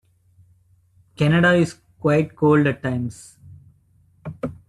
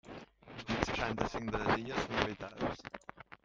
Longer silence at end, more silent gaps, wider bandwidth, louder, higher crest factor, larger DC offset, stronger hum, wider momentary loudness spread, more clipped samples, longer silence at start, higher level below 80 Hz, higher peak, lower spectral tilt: about the same, 0.15 s vs 0.1 s; neither; first, 11.5 kHz vs 9.4 kHz; first, -20 LUFS vs -36 LUFS; second, 16 dB vs 28 dB; neither; neither; about the same, 18 LU vs 18 LU; neither; first, 1.2 s vs 0.05 s; about the same, -56 dBFS vs -54 dBFS; first, -6 dBFS vs -10 dBFS; first, -7 dB/octave vs -5 dB/octave